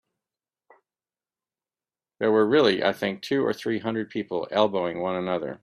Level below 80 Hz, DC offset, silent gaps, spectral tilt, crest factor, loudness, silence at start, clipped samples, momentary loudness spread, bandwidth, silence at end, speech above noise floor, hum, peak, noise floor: -68 dBFS; under 0.1%; none; -6 dB/octave; 20 dB; -25 LUFS; 2.2 s; under 0.1%; 9 LU; 13.5 kHz; 0.05 s; over 66 dB; none; -6 dBFS; under -90 dBFS